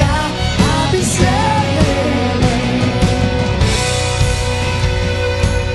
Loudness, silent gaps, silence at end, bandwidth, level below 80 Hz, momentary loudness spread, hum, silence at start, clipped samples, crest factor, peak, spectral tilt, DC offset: -15 LUFS; none; 0 s; 12.5 kHz; -22 dBFS; 3 LU; none; 0 s; under 0.1%; 14 dB; 0 dBFS; -5 dB/octave; under 0.1%